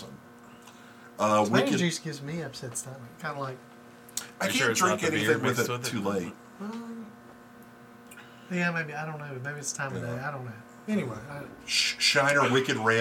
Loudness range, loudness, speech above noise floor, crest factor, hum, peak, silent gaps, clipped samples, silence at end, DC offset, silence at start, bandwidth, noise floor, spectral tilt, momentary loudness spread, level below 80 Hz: 7 LU; -28 LUFS; 22 dB; 20 dB; none; -8 dBFS; none; under 0.1%; 0 s; under 0.1%; 0 s; 19 kHz; -50 dBFS; -3.5 dB/octave; 20 LU; -70 dBFS